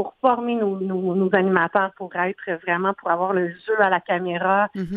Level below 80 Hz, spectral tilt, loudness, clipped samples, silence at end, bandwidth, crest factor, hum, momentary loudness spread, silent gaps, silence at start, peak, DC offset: -62 dBFS; -9 dB/octave; -22 LUFS; under 0.1%; 0 s; 4.7 kHz; 20 dB; none; 6 LU; none; 0 s; -2 dBFS; under 0.1%